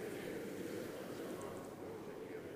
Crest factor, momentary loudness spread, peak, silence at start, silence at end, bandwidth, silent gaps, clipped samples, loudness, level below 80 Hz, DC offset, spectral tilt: 14 dB; 4 LU; -34 dBFS; 0 s; 0 s; 15.5 kHz; none; under 0.1%; -47 LUFS; -74 dBFS; under 0.1%; -5 dB/octave